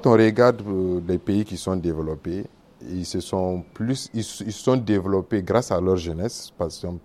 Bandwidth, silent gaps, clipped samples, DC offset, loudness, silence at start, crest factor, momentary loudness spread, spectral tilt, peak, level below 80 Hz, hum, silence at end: 14 kHz; none; under 0.1%; under 0.1%; -24 LUFS; 0 s; 20 dB; 11 LU; -6.5 dB/octave; -2 dBFS; -48 dBFS; none; 0.05 s